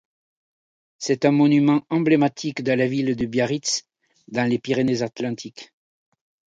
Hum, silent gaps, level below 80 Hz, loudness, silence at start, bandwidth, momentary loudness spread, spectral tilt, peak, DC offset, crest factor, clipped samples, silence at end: none; none; -60 dBFS; -21 LUFS; 1 s; 9.2 kHz; 12 LU; -5.5 dB/octave; -4 dBFS; under 0.1%; 18 dB; under 0.1%; 0.95 s